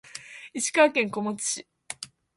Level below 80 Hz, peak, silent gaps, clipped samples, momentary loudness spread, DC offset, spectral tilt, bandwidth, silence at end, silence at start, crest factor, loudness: -74 dBFS; -8 dBFS; none; under 0.1%; 20 LU; under 0.1%; -2.5 dB/octave; 11.5 kHz; 0.3 s; 0.15 s; 20 dB; -25 LUFS